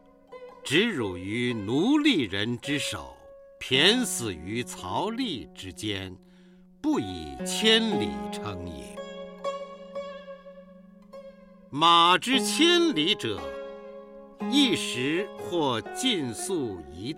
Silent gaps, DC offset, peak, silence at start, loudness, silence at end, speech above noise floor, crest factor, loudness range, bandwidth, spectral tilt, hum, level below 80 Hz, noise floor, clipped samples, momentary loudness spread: none; under 0.1%; -6 dBFS; 0.3 s; -25 LUFS; 0 s; 28 dB; 22 dB; 9 LU; 16.5 kHz; -3.5 dB/octave; none; -58 dBFS; -54 dBFS; under 0.1%; 20 LU